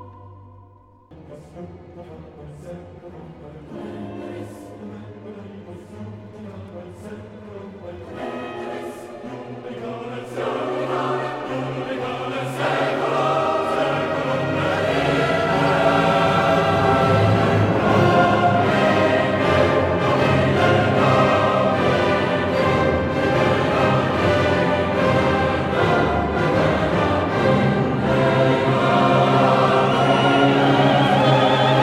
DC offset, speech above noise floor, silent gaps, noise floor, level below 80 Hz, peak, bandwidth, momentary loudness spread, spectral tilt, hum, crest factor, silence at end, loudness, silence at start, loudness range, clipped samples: under 0.1%; 16 dB; none; -49 dBFS; -44 dBFS; -2 dBFS; 13.5 kHz; 21 LU; -6.5 dB/octave; none; 16 dB; 0 s; -18 LUFS; 0 s; 19 LU; under 0.1%